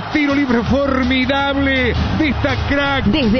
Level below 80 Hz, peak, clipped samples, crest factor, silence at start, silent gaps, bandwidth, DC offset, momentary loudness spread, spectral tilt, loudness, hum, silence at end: -28 dBFS; -2 dBFS; under 0.1%; 14 dB; 0 s; none; 6.6 kHz; under 0.1%; 2 LU; -6.5 dB/octave; -16 LUFS; none; 0 s